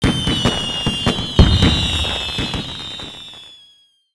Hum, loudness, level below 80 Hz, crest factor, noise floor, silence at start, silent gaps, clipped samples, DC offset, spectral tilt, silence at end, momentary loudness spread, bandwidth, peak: none; -17 LUFS; -26 dBFS; 18 dB; -53 dBFS; 0 s; none; under 0.1%; under 0.1%; -5 dB/octave; 0.6 s; 17 LU; 11 kHz; 0 dBFS